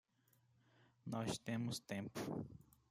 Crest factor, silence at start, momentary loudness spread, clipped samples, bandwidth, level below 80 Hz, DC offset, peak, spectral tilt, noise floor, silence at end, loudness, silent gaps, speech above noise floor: 20 dB; 1.05 s; 13 LU; under 0.1%; 16 kHz; -76 dBFS; under 0.1%; -28 dBFS; -5 dB/octave; -77 dBFS; 0.25 s; -46 LUFS; none; 32 dB